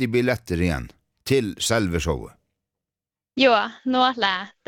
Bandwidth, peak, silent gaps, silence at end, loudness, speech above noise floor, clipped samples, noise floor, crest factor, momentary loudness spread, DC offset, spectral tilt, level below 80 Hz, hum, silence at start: 18 kHz; -4 dBFS; none; 0.2 s; -22 LUFS; over 68 dB; under 0.1%; under -90 dBFS; 20 dB; 13 LU; under 0.1%; -4.5 dB/octave; -44 dBFS; none; 0 s